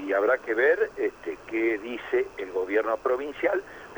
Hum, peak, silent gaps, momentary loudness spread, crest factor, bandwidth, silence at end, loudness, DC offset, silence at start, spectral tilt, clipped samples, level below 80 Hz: none; -10 dBFS; none; 8 LU; 16 dB; over 20 kHz; 0 s; -27 LUFS; under 0.1%; 0 s; -5 dB/octave; under 0.1%; -60 dBFS